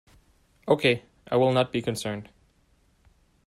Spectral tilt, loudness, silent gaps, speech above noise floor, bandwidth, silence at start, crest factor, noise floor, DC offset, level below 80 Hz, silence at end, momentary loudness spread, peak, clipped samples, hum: -5.5 dB/octave; -25 LUFS; none; 40 dB; 14 kHz; 0.65 s; 20 dB; -64 dBFS; under 0.1%; -62 dBFS; 1.25 s; 12 LU; -8 dBFS; under 0.1%; none